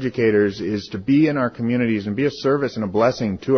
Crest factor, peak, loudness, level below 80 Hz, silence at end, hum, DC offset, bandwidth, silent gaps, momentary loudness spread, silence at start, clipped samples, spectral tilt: 14 dB; -6 dBFS; -20 LUFS; -50 dBFS; 0 s; none; under 0.1%; 6.6 kHz; none; 7 LU; 0 s; under 0.1%; -7.5 dB/octave